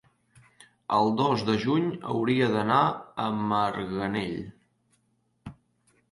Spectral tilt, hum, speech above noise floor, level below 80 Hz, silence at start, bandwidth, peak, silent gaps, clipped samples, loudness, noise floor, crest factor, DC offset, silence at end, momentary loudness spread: -7 dB/octave; none; 46 dB; -60 dBFS; 0.9 s; 11.5 kHz; -8 dBFS; none; under 0.1%; -26 LUFS; -71 dBFS; 20 dB; under 0.1%; 0.6 s; 21 LU